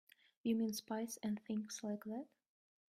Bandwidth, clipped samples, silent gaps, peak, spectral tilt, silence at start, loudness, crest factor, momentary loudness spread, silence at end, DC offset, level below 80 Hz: 16 kHz; under 0.1%; none; -28 dBFS; -4.5 dB/octave; 0.45 s; -43 LUFS; 16 dB; 9 LU; 0.65 s; under 0.1%; -86 dBFS